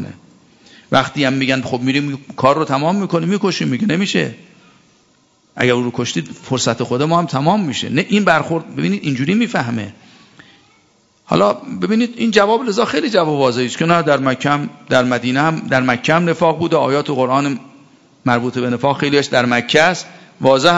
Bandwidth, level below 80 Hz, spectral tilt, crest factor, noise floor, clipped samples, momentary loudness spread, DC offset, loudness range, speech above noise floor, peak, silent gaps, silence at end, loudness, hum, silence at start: 10 kHz; -56 dBFS; -5 dB/octave; 16 dB; -55 dBFS; under 0.1%; 7 LU; under 0.1%; 4 LU; 40 dB; 0 dBFS; none; 0 s; -16 LUFS; none; 0 s